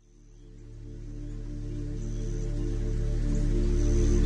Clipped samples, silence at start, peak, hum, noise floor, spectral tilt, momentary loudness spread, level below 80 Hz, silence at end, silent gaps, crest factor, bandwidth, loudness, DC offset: under 0.1%; 0.25 s; -14 dBFS; none; -51 dBFS; -7 dB/octave; 18 LU; -30 dBFS; 0 s; none; 14 dB; 8.6 kHz; -32 LUFS; under 0.1%